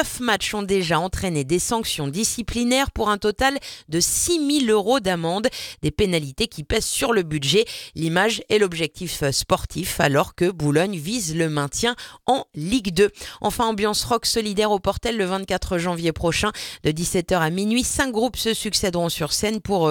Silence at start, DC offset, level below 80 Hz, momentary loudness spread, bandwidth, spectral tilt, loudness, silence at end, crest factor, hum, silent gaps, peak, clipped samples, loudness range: 0 s; under 0.1%; -40 dBFS; 6 LU; 19 kHz; -3.5 dB/octave; -22 LUFS; 0 s; 20 dB; none; none; -2 dBFS; under 0.1%; 2 LU